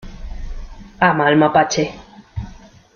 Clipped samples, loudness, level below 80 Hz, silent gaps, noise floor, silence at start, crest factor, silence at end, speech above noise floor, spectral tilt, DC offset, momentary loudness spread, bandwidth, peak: under 0.1%; -16 LUFS; -34 dBFS; none; -41 dBFS; 0.05 s; 18 dB; 0.3 s; 26 dB; -5 dB/octave; under 0.1%; 23 LU; 7 kHz; -2 dBFS